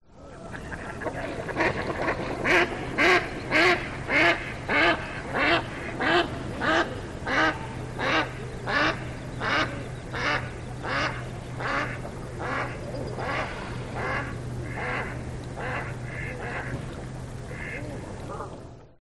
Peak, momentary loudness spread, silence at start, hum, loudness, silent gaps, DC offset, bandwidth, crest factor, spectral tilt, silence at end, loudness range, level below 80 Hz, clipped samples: -8 dBFS; 15 LU; 0.1 s; none; -27 LUFS; none; 0.1%; 12 kHz; 20 dB; -5 dB/octave; 0.15 s; 10 LU; -44 dBFS; under 0.1%